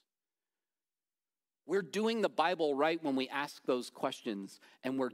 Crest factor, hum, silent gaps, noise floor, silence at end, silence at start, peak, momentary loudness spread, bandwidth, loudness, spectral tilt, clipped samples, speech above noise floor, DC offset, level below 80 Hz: 20 dB; none; none; under -90 dBFS; 0 s; 1.65 s; -16 dBFS; 10 LU; 16 kHz; -35 LUFS; -4.5 dB/octave; under 0.1%; over 56 dB; under 0.1%; under -90 dBFS